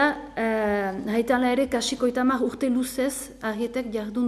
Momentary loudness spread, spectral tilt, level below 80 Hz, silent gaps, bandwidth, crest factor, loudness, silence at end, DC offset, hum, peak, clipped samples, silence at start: 7 LU; -4 dB/octave; -52 dBFS; none; 14 kHz; 16 dB; -25 LUFS; 0 s; under 0.1%; none; -10 dBFS; under 0.1%; 0 s